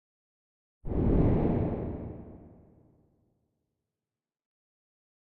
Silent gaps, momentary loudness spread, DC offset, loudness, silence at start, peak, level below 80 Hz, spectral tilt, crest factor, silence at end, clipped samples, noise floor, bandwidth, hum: none; 21 LU; under 0.1%; -29 LUFS; 0.85 s; -14 dBFS; -40 dBFS; -11 dB/octave; 20 dB; 2.7 s; under 0.1%; under -90 dBFS; 4.2 kHz; none